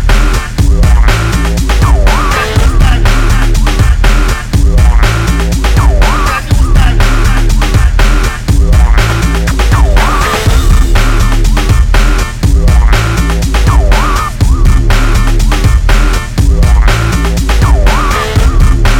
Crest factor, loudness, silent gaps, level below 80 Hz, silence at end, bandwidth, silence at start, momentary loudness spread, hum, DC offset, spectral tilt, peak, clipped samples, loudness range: 6 dB; -10 LUFS; none; -8 dBFS; 0 s; 16 kHz; 0 s; 3 LU; none; under 0.1%; -5 dB/octave; 0 dBFS; 2%; 0 LU